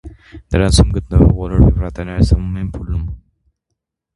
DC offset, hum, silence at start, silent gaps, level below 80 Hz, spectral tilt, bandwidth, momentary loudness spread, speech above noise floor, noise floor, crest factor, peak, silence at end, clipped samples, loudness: under 0.1%; none; 0.05 s; none; -20 dBFS; -6.5 dB/octave; 11.5 kHz; 11 LU; 62 dB; -76 dBFS; 16 dB; 0 dBFS; 0.95 s; under 0.1%; -15 LUFS